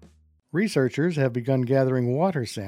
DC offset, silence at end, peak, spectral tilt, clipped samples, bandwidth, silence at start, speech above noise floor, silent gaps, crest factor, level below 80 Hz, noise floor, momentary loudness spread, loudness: under 0.1%; 0 s; -10 dBFS; -7 dB/octave; under 0.1%; 14.5 kHz; 0.05 s; 33 dB; none; 16 dB; -64 dBFS; -56 dBFS; 3 LU; -24 LUFS